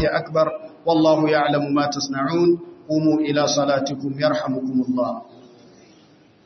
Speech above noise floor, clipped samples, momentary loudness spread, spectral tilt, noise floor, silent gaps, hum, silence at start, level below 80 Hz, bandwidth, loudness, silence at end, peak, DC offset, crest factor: 32 dB; under 0.1%; 8 LU; -5 dB/octave; -52 dBFS; none; none; 0 s; -60 dBFS; 6.4 kHz; -20 LUFS; 1 s; -4 dBFS; under 0.1%; 16 dB